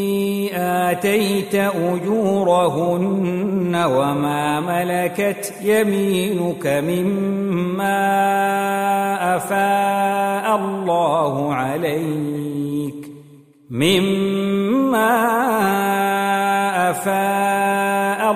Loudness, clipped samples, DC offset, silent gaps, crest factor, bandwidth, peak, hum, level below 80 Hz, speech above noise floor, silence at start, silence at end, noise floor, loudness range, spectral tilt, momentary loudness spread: -19 LUFS; under 0.1%; under 0.1%; none; 16 dB; 15.5 kHz; -4 dBFS; none; -60 dBFS; 27 dB; 0 s; 0 s; -46 dBFS; 3 LU; -5.5 dB/octave; 5 LU